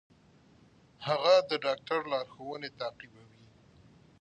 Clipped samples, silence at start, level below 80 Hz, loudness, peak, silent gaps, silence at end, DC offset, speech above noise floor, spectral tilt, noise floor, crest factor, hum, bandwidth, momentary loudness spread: under 0.1%; 1 s; -72 dBFS; -31 LUFS; -12 dBFS; none; 1.15 s; under 0.1%; 31 dB; -4 dB/octave; -61 dBFS; 22 dB; none; 8.6 kHz; 17 LU